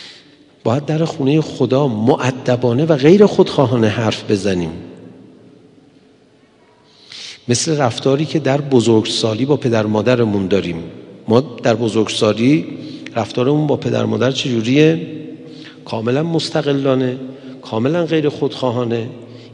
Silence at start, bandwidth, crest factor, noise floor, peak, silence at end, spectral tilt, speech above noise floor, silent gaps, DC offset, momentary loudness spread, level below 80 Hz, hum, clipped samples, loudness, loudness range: 0 s; 11 kHz; 16 dB; -50 dBFS; 0 dBFS; 0 s; -6 dB/octave; 35 dB; none; under 0.1%; 17 LU; -60 dBFS; none; under 0.1%; -16 LUFS; 7 LU